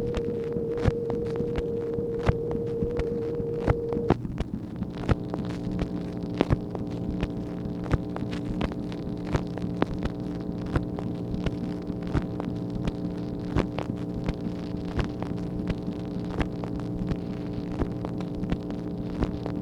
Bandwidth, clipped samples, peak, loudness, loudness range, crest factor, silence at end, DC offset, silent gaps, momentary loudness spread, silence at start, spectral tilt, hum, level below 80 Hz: 11 kHz; under 0.1%; -4 dBFS; -30 LUFS; 3 LU; 26 dB; 0 s; under 0.1%; none; 6 LU; 0 s; -8.5 dB/octave; none; -38 dBFS